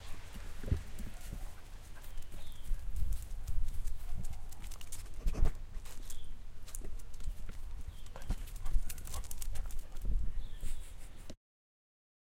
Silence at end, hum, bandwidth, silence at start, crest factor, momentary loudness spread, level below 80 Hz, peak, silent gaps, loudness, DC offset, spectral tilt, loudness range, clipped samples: 1 s; none; 15.5 kHz; 0 s; 18 dB; 12 LU; -38 dBFS; -14 dBFS; none; -46 LUFS; under 0.1%; -4.5 dB/octave; 3 LU; under 0.1%